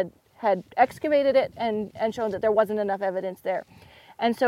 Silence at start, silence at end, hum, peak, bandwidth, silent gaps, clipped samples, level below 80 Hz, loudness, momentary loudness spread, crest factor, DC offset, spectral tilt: 0 s; 0 s; none; -6 dBFS; 15.5 kHz; none; under 0.1%; -64 dBFS; -25 LUFS; 9 LU; 20 dB; under 0.1%; -6 dB/octave